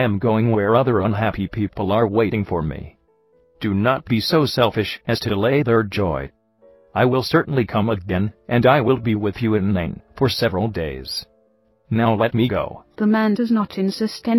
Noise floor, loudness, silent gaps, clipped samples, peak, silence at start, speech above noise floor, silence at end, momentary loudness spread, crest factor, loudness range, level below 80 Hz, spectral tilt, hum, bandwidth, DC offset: -60 dBFS; -20 LUFS; none; under 0.1%; -2 dBFS; 0 s; 41 dB; 0 s; 9 LU; 18 dB; 2 LU; -44 dBFS; -7 dB/octave; none; 17 kHz; under 0.1%